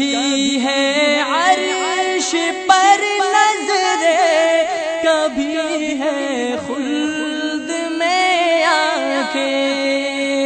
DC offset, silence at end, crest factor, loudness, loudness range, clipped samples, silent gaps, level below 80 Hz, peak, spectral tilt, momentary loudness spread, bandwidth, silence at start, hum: under 0.1%; 0 s; 16 dB; -16 LUFS; 4 LU; under 0.1%; none; -58 dBFS; 0 dBFS; -1 dB/octave; 7 LU; 9.2 kHz; 0 s; none